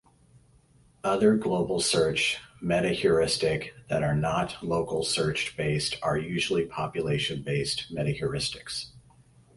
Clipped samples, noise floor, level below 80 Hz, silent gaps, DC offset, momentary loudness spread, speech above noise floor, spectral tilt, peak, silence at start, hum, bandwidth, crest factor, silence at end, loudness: under 0.1%; -60 dBFS; -52 dBFS; none; under 0.1%; 8 LU; 33 dB; -4.5 dB/octave; -10 dBFS; 1.05 s; none; 11.5 kHz; 18 dB; 0.55 s; -27 LUFS